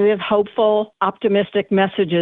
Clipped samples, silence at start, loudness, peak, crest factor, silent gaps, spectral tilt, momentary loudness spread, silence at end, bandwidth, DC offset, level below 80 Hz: under 0.1%; 0 s; -18 LUFS; -4 dBFS; 14 dB; none; -9.5 dB/octave; 3 LU; 0 s; 4.1 kHz; under 0.1%; -60 dBFS